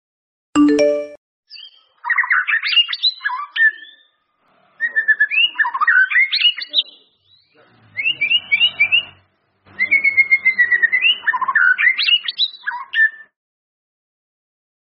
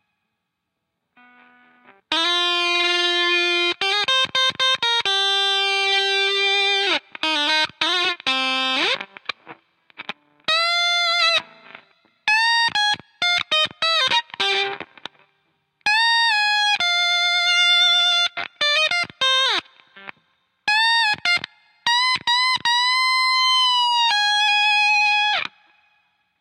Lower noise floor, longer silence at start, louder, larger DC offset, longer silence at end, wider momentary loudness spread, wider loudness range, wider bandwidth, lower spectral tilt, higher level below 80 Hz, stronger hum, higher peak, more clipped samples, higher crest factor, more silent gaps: second, -61 dBFS vs -78 dBFS; second, 0.55 s vs 2.1 s; first, -14 LUFS vs -17 LUFS; neither; first, 1.7 s vs 0.95 s; first, 10 LU vs 7 LU; about the same, 4 LU vs 5 LU; second, 6 kHz vs 14 kHz; second, 2.5 dB/octave vs 0 dB/octave; first, -66 dBFS vs -72 dBFS; neither; first, -2 dBFS vs -6 dBFS; neither; about the same, 16 dB vs 16 dB; first, 1.17-1.43 s vs none